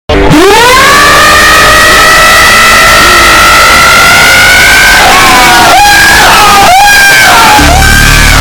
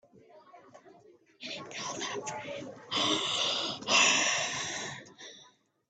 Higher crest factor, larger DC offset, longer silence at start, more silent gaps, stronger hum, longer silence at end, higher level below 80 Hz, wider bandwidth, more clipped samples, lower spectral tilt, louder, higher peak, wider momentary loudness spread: second, 2 dB vs 22 dB; neither; about the same, 0.1 s vs 0.15 s; neither; neither; second, 0 s vs 0.45 s; first, -16 dBFS vs -78 dBFS; first, over 20 kHz vs 9.6 kHz; first, 20% vs under 0.1%; first, -2 dB/octave vs -0.5 dB/octave; first, 0 LUFS vs -29 LUFS; first, 0 dBFS vs -10 dBFS; second, 2 LU vs 21 LU